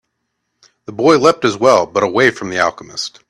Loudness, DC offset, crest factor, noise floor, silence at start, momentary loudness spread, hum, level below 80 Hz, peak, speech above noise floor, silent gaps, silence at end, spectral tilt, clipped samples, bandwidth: -14 LUFS; under 0.1%; 16 dB; -72 dBFS; 0.9 s; 12 LU; none; -56 dBFS; 0 dBFS; 58 dB; none; 0.2 s; -4 dB/octave; under 0.1%; 12 kHz